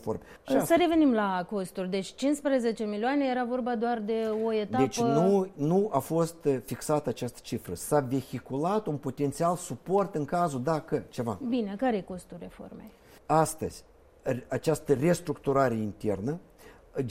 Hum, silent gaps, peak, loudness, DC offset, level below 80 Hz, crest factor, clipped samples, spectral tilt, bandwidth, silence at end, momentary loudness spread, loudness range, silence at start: none; none; -10 dBFS; -29 LUFS; under 0.1%; -58 dBFS; 18 dB; under 0.1%; -6 dB/octave; 16 kHz; 0 s; 12 LU; 4 LU; 0 s